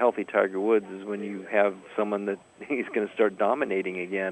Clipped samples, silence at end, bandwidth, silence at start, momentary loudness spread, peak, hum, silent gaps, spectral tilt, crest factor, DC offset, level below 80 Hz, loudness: under 0.1%; 0 s; 8.4 kHz; 0 s; 9 LU; -8 dBFS; none; none; -6.5 dB/octave; 20 dB; under 0.1%; -76 dBFS; -27 LUFS